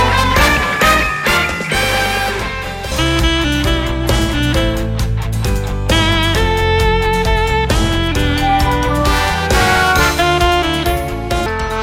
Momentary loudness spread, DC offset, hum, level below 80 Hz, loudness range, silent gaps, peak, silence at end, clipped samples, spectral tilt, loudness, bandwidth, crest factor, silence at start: 7 LU; under 0.1%; none; -20 dBFS; 3 LU; none; 0 dBFS; 0 s; under 0.1%; -4.5 dB/octave; -14 LUFS; 16.5 kHz; 14 dB; 0 s